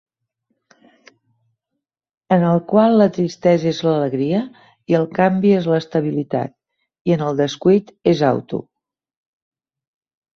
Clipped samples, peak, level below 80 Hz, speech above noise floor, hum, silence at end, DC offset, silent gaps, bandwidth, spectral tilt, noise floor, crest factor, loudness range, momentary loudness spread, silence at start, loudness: under 0.1%; -2 dBFS; -60 dBFS; 63 dB; none; 1.75 s; under 0.1%; 7.01-7.05 s; 7.2 kHz; -7.5 dB/octave; -80 dBFS; 18 dB; 3 LU; 9 LU; 2.3 s; -17 LUFS